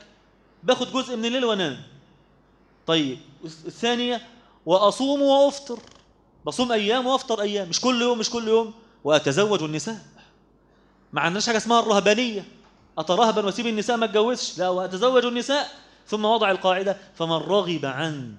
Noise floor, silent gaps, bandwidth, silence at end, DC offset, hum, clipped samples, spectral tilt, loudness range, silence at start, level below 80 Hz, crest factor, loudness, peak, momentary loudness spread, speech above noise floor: -58 dBFS; none; 11 kHz; 0 s; under 0.1%; none; under 0.1%; -4 dB/octave; 4 LU; 0.65 s; -64 dBFS; 22 dB; -23 LUFS; -2 dBFS; 14 LU; 36 dB